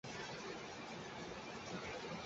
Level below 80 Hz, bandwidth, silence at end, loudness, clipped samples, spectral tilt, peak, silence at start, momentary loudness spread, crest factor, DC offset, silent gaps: -70 dBFS; 8 kHz; 0 s; -48 LUFS; under 0.1%; -3 dB/octave; -34 dBFS; 0.05 s; 2 LU; 14 dB; under 0.1%; none